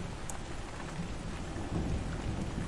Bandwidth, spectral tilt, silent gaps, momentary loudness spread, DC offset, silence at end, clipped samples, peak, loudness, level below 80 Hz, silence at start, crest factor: 11.5 kHz; -5.5 dB/octave; none; 6 LU; under 0.1%; 0 s; under 0.1%; -20 dBFS; -39 LUFS; -42 dBFS; 0 s; 16 dB